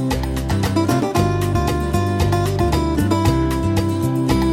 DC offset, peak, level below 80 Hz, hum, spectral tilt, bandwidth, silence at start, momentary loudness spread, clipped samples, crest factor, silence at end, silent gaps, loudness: under 0.1%; -4 dBFS; -28 dBFS; none; -6.5 dB/octave; 16.5 kHz; 0 s; 3 LU; under 0.1%; 14 dB; 0 s; none; -19 LUFS